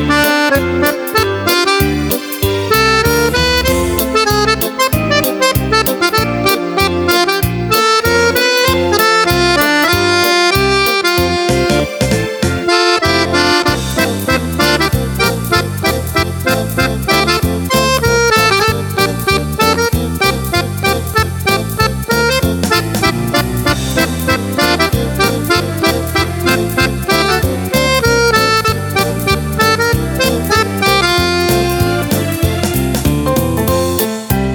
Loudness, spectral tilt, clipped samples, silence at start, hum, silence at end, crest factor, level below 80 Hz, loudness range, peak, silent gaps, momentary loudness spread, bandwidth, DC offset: -12 LUFS; -4 dB/octave; under 0.1%; 0 s; none; 0 s; 12 dB; -28 dBFS; 3 LU; 0 dBFS; none; 5 LU; over 20 kHz; under 0.1%